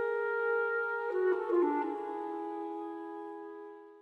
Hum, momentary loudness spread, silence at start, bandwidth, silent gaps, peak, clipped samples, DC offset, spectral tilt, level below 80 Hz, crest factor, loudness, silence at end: none; 15 LU; 0 s; 4.5 kHz; none; -20 dBFS; under 0.1%; under 0.1%; -6 dB/octave; -86 dBFS; 14 dB; -34 LUFS; 0 s